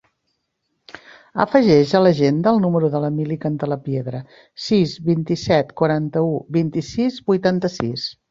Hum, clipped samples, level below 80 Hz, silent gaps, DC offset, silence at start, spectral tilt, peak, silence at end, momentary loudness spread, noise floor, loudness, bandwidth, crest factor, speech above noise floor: none; under 0.1%; -54 dBFS; none; under 0.1%; 1.35 s; -7 dB/octave; -2 dBFS; 0.2 s; 11 LU; -73 dBFS; -19 LUFS; 7.6 kHz; 18 dB; 55 dB